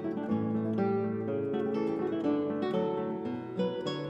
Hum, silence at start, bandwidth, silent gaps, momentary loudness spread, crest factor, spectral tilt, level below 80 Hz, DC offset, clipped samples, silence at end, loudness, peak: none; 0 s; 7.8 kHz; none; 4 LU; 12 dB; -8.5 dB/octave; -72 dBFS; under 0.1%; under 0.1%; 0 s; -32 LUFS; -18 dBFS